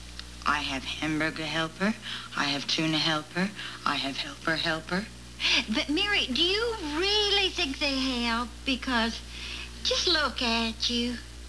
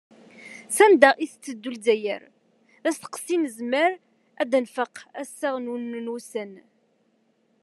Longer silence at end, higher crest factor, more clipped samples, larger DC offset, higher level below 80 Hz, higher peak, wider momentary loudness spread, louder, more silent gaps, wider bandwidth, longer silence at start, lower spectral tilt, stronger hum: second, 0 s vs 1.05 s; second, 18 dB vs 24 dB; neither; first, 0.2% vs under 0.1%; first, -46 dBFS vs -82 dBFS; second, -10 dBFS vs 0 dBFS; second, 9 LU vs 19 LU; second, -27 LUFS vs -24 LUFS; neither; second, 11 kHz vs 12.5 kHz; second, 0 s vs 0.4 s; about the same, -3 dB/octave vs -2.5 dB/octave; first, 60 Hz at -50 dBFS vs none